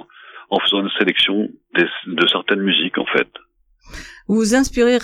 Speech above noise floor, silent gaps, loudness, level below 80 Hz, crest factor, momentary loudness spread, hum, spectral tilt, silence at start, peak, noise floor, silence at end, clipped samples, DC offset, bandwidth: 24 dB; none; -17 LUFS; -44 dBFS; 18 dB; 8 LU; none; -3.5 dB/octave; 0.25 s; -2 dBFS; -41 dBFS; 0 s; under 0.1%; under 0.1%; 15 kHz